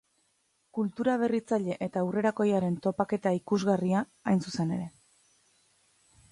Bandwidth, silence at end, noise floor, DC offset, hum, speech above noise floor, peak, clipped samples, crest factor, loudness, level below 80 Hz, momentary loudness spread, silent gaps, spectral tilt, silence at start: 11.5 kHz; 1.4 s; -73 dBFS; under 0.1%; none; 45 dB; -12 dBFS; under 0.1%; 18 dB; -29 LUFS; -68 dBFS; 6 LU; none; -7 dB/octave; 0.75 s